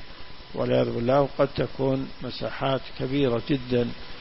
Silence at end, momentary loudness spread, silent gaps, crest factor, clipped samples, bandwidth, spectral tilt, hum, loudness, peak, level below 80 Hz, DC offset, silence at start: 0 s; 10 LU; none; 18 dB; under 0.1%; 5.8 kHz; -11 dB/octave; none; -26 LUFS; -8 dBFS; -46 dBFS; under 0.1%; 0 s